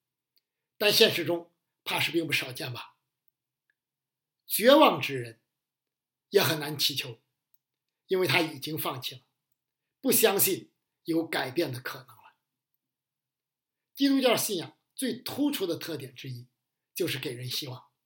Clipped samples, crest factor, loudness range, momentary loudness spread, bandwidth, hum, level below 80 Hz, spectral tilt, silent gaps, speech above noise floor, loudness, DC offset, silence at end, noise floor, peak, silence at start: under 0.1%; 26 dB; 7 LU; 19 LU; 17 kHz; none; -82 dBFS; -3.5 dB/octave; none; over 63 dB; -27 LUFS; under 0.1%; 0.25 s; under -90 dBFS; -4 dBFS; 0.8 s